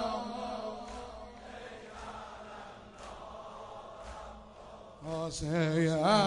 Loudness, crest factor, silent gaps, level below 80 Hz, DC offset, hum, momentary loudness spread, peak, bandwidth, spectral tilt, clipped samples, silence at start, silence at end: -37 LUFS; 22 dB; none; -56 dBFS; under 0.1%; none; 20 LU; -14 dBFS; 11 kHz; -5.5 dB/octave; under 0.1%; 0 s; 0 s